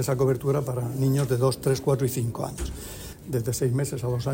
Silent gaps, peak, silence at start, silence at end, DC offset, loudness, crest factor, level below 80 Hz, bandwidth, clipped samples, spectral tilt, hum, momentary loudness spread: none; -10 dBFS; 0 s; 0 s; under 0.1%; -26 LUFS; 16 dB; -44 dBFS; 16.5 kHz; under 0.1%; -6.5 dB/octave; none; 11 LU